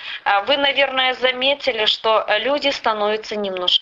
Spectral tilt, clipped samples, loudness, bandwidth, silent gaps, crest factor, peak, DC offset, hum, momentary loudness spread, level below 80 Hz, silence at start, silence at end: -2.5 dB/octave; under 0.1%; -18 LUFS; 7.8 kHz; none; 16 dB; -2 dBFS; under 0.1%; none; 5 LU; -58 dBFS; 0 s; 0 s